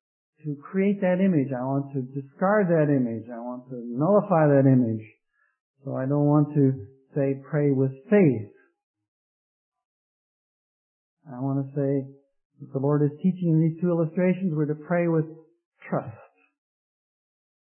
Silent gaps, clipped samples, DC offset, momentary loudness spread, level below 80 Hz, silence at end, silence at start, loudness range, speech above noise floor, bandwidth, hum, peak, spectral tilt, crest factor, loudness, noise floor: 5.60-5.74 s, 8.83-8.94 s, 9.08-9.72 s, 9.85-11.17 s, 12.45-12.50 s, 15.65-15.72 s; under 0.1%; under 0.1%; 15 LU; -76 dBFS; 1.6 s; 0.45 s; 9 LU; over 67 dB; 3.2 kHz; none; -8 dBFS; -13.5 dB/octave; 18 dB; -24 LUFS; under -90 dBFS